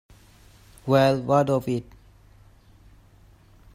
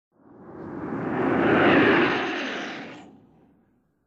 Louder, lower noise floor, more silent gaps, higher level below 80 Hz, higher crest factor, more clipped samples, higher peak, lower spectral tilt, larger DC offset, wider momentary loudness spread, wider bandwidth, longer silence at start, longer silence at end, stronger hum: about the same, -22 LUFS vs -22 LUFS; second, -54 dBFS vs -65 dBFS; neither; about the same, -54 dBFS vs -58 dBFS; about the same, 20 dB vs 18 dB; neither; about the same, -6 dBFS vs -8 dBFS; about the same, -7 dB/octave vs -6.5 dB/octave; neither; second, 11 LU vs 20 LU; first, 15.5 kHz vs 7.6 kHz; first, 0.85 s vs 0.4 s; first, 1.9 s vs 1 s; neither